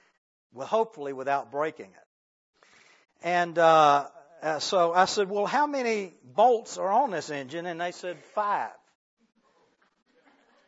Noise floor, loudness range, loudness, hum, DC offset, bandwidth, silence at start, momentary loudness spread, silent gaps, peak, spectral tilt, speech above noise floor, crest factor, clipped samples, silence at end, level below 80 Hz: -67 dBFS; 9 LU; -26 LUFS; none; under 0.1%; 8 kHz; 0.55 s; 14 LU; 2.06-2.53 s; -8 dBFS; -3.5 dB/octave; 41 dB; 20 dB; under 0.1%; 1.95 s; -82 dBFS